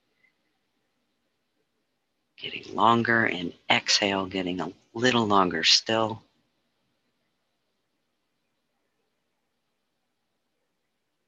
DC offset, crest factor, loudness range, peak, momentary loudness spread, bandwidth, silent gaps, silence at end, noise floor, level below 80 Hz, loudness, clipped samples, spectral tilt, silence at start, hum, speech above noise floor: under 0.1%; 24 dB; 6 LU; -6 dBFS; 16 LU; 9 kHz; none; 5.1 s; -80 dBFS; -64 dBFS; -23 LUFS; under 0.1%; -3 dB/octave; 2.4 s; none; 55 dB